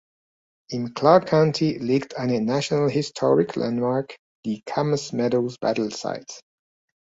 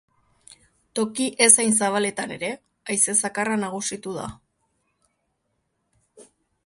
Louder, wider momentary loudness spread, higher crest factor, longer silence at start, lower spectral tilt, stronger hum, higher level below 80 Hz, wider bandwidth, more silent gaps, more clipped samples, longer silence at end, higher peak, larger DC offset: about the same, -23 LUFS vs -21 LUFS; second, 14 LU vs 18 LU; about the same, 22 dB vs 26 dB; second, 0.7 s vs 0.95 s; first, -6 dB/octave vs -2 dB/octave; neither; about the same, -62 dBFS vs -64 dBFS; second, 8 kHz vs 11.5 kHz; first, 4.19-4.43 s vs none; neither; first, 0.65 s vs 0.45 s; about the same, -2 dBFS vs 0 dBFS; neither